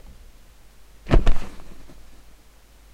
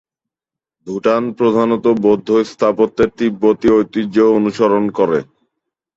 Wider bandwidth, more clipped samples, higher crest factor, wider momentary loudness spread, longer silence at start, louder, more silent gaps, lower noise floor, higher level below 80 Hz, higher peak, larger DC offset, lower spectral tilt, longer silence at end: second, 7 kHz vs 7.8 kHz; neither; first, 20 dB vs 14 dB; first, 27 LU vs 4 LU; first, 1.05 s vs 0.85 s; second, -24 LUFS vs -15 LUFS; neither; second, -50 dBFS vs -87 dBFS; first, -24 dBFS vs -50 dBFS; about the same, -2 dBFS vs -2 dBFS; neither; about the same, -7 dB/octave vs -7 dB/octave; first, 1.1 s vs 0.75 s